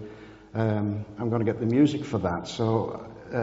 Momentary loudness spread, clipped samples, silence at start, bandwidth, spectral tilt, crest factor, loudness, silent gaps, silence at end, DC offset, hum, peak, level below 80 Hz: 14 LU; under 0.1%; 0 s; 7.8 kHz; -7 dB/octave; 18 dB; -27 LUFS; none; 0 s; under 0.1%; none; -10 dBFS; -58 dBFS